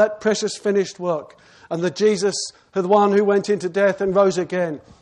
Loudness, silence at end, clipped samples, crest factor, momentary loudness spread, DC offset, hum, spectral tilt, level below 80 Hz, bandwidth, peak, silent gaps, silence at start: -20 LUFS; 0.2 s; under 0.1%; 16 dB; 10 LU; under 0.1%; none; -5 dB/octave; -60 dBFS; 10.5 kHz; -4 dBFS; none; 0 s